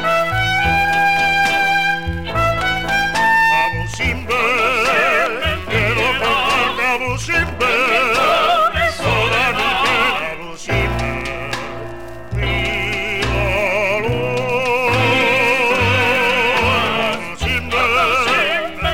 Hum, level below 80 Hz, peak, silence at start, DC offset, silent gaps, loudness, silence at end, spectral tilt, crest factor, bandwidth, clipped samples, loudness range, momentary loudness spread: none; -32 dBFS; -4 dBFS; 0 s; 2%; none; -15 LUFS; 0 s; -4 dB/octave; 14 dB; 17 kHz; under 0.1%; 5 LU; 8 LU